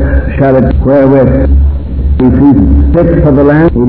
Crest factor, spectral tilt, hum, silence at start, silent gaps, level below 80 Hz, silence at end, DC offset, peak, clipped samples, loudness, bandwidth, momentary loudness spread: 6 dB; -12.5 dB/octave; none; 0 s; none; -12 dBFS; 0 s; 4%; 0 dBFS; 6%; -7 LUFS; 4.2 kHz; 5 LU